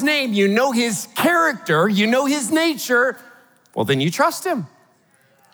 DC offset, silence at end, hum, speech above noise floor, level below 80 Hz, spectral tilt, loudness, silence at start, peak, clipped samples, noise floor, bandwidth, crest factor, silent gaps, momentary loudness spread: under 0.1%; 0.85 s; none; 39 dB; -78 dBFS; -4 dB/octave; -18 LUFS; 0 s; -4 dBFS; under 0.1%; -58 dBFS; over 20 kHz; 16 dB; none; 9 LU